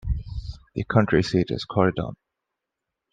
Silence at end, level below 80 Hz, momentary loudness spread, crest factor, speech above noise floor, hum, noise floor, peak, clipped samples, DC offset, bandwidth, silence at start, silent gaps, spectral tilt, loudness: 1 s; -38 dBFS; 15 LU; 22 dB; 62 dB; none; -84 dBFS; -4 dBFS; under 0.1%; under 0.1%; 9.2 kHz; 0.05 s; none; -7 dB/octave; -24 LUFS